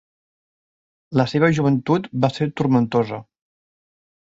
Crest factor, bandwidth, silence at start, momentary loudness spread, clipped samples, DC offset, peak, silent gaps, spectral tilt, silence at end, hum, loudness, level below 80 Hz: 18 dB; 8 kHz; 1.1 s; 6 LU; under 0.1%; under 0.1%; -4 dBFS; none; -7.5 dB/octave; 1.15 s; none; -20 LUFS; -58 dBFS